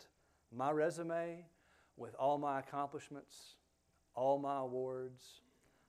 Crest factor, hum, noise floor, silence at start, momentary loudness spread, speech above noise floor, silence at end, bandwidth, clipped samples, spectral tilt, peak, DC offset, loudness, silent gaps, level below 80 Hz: 18 dB; none; -77 dBFS; 0 s; 20 LU; 37 dB; 0.5 s; 14.5 kHz; under 0.1%; -6 dB/octave; -22 dBFS; under 0.1%; -40 LUFS; none; -82 dBFS